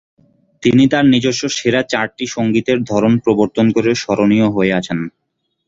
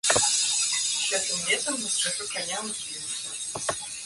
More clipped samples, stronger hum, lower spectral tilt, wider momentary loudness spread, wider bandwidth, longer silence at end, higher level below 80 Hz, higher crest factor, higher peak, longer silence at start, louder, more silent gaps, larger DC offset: neither; neither; first, -5.5 dB/octave vs 0.5 dB/octave; second, 7 LU vs 10 LU; second, 7.8 kHz vs 12 kHz; first, 0.6 s vs 0 s; first, -50 dBFS vs -62 dBFS; second, 14 dB vs 22 dB; first, -2 dBFS vs -6 dBFS; first, 0.6 s vs 0.05 s; first, -15 LUFS vs -25 LUFS; neither; neither